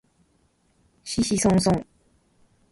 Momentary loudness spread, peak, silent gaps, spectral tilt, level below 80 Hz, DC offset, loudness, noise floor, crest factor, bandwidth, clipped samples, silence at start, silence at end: 11 LU; -8 dBFS; none; -5 dB/octave; -48 dBFS; under 0.1%; -23 LUFS; -65 dBFS; 18 dB; 11.5 kHz; under 0.1%; 1.05 s; 0.9 s